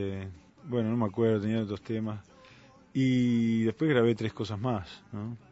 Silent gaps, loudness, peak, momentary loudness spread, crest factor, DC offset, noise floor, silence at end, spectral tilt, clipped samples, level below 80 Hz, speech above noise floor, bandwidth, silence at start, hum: none; -29 LUFS; -12 dBFS; 15 LU; 18 dB; under 0.1%; -56 dBFS; 0.15 s; -8 dB/octave; under 0.1%; -64 dBFS; 27 dB; 8 kHz; 0 s; none